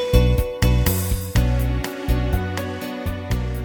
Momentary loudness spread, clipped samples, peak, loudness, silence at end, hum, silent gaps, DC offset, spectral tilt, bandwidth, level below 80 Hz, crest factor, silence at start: 9 LU; under 0.1%; -2 dBFS; -22 LUFS; 0 s; none; none; under 0.1%; -6 dB/octave; over 20 kHz; -24 dBFS; 18 dB; 0 s